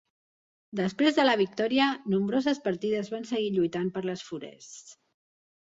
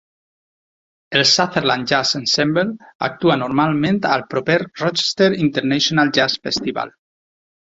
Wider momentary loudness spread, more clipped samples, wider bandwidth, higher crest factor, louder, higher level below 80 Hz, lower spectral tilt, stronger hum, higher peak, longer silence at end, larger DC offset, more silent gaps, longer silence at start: first, 16 LU vs 7 LU; neither; about the same, 7.8 kHz vs 7.8 kHz; about the same, 18 dB vs 18 dB; second, -27 LUFS vs -17 LUFS; second, -72 dBFS vs -56 dBFS; first, -5.5 dB/octave vs -4 dB/octave; neither; second, -10 dBFS vs -2 dBFS; second, 0.7 s vs 0.85 s; neither; second, none vs 2.95-3.00 s; second, 0.75 s vs 1.1 s